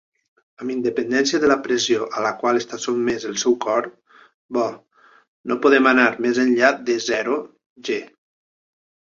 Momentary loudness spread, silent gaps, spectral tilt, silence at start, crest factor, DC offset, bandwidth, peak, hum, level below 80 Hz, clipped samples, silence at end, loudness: 11 LU; 4.34-4.49 s, 5.28-5.44 s, 7.66-7.76 s; -3 dB/octave; 0.6 s; 20 dB; under 0.1%; 7.6 kHz; 0 dBFS; none; -62 dBFS; under 0.1%; 1.1 s; -20 LUFS